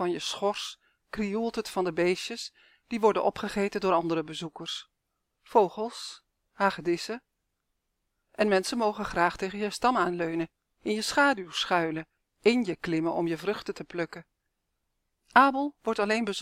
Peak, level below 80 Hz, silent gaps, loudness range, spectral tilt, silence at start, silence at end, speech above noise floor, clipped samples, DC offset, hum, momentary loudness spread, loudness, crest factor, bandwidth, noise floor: -6 dBFS; -60 dBFS; none; 4 LU; -4.5 dB/octave; 0 s; 0 s; 53 dB; under 0.1%; under 0.1%; none; 13 LU; -28 LUFS; 24 dB; 16 kHz; -81 dBFS